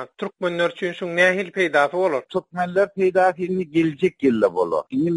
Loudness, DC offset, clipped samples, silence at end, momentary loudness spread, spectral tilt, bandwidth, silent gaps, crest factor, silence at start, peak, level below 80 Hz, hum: -21 LUFS; under 0.1%; under 0.1%; 0 s; 7 LU; -6 dB/octave; 11.5 kHz; none; 18 dB; 0 s; -4 dBFS; -64 dBFS; none